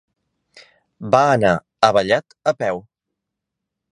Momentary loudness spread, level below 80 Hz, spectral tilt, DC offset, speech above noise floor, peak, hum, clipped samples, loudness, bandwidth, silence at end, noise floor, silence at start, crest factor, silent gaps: 10 LU; -54 dBFS; -5 dB/octave; under 0.1%; 65 dB; 0 dBFS; none; under 0.1%; -18 LUFS; 10.5 kHz; 1.1 s; -81 dBFS; 1 s; 20 dB; none